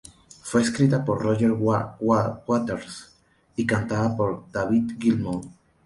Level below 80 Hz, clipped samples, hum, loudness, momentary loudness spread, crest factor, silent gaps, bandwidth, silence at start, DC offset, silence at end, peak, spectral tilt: -52 dBFS; under 0.1%; none; -24 LUFS; 12 LU; 18 dB; none; 11.5 kHz; 0.45 s; under 0.1%; 0.35 s; -6 dBFS; -6.5 dB/octave